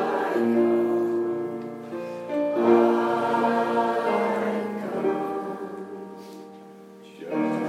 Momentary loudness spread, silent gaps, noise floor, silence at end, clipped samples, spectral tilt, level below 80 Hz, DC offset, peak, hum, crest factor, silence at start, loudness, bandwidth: 19 LU; none; -45 dBFS; 0 s; under 0.1%; -7 dB/octave; -84 dBFS; under 0.1%; -6 dBFS; none; 18 dB; 0 s; -25 LUFS; 13 kHz